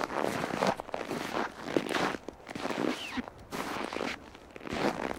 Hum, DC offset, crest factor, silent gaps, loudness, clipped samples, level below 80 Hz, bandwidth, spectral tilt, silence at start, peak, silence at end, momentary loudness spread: none; under 0.1%; 24 dB; none; -34 LUFS; under 0.1%; -60 dBFS; 17.5 kHz; -4.5 dB/octave; 0 s; -12 dBFS; 0 s; 10 LU